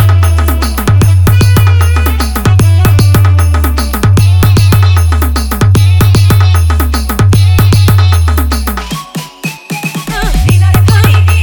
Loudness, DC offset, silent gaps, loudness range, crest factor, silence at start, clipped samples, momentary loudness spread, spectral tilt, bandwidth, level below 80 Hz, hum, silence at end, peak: -8 LUFS; under 0.1%; none; 3 LU; 6 dB; 0 s; 0.3%; 9 LU; -6 dB/octave; over 20 kHz; -14 dBFS; none; 0 s; 0 dBFS